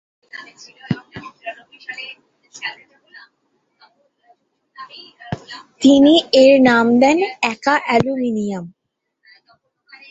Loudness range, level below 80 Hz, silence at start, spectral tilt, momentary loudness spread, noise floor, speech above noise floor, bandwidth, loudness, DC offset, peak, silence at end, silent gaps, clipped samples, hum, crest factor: 21 LU; -56 dBFS; 0.35 s; -5 dB/octave; 25 LU; -67 dBFS; 52 dB; 8 kHz; -14 LUFS; under 0.1%; 0 dBFS; 1.4 s; none; under 0.1%; none; 18 dB